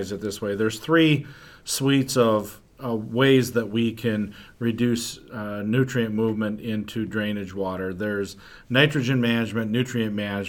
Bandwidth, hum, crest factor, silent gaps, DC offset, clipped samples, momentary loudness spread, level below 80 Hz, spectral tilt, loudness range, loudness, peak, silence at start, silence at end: 19 kHz; none; 20 dB; none; under 0.1%; under 0.1%; 11 LU; -56 dBFS; -5.5 dB/octave; 4 LU; -24 LUFS; -4 dBFS; 0 s; 0 s